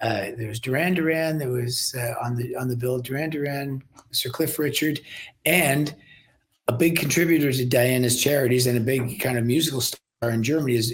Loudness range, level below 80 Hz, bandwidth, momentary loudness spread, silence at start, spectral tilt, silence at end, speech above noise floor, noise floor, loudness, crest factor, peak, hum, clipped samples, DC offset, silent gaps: 5 LU; -58 dBFS; 17 kHz; 8 LU; 0 s; -4.5 dB/octave; 0 s; 37 dB; -60 dBFS; -23 LUFS; 22 dB; -2 dBFS; none; under 0.1%; under 0.1%; none